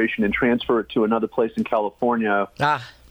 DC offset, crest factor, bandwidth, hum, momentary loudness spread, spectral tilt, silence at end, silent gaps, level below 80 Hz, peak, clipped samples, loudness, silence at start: under 0.1%; 14 dB; 9.4 kHz; none; 4 LU; -7 dB/octave; 0.2 s; none; -50 dBFS; -6 dBFS; under 0.1%; -22 LUFS; 0 s